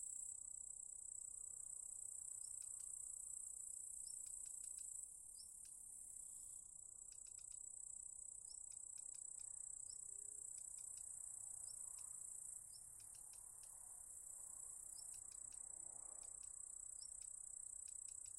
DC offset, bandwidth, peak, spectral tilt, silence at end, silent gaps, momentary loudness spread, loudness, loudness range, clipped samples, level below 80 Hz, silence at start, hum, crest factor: under 0.1%; 16 kHz; -38 dBFS; 0.5 dB/octave; 0 s; none; 5 LU; -52 LUFS; 3 LU; under 0.1%; -80 dBFS; 0 s; none; 18 dB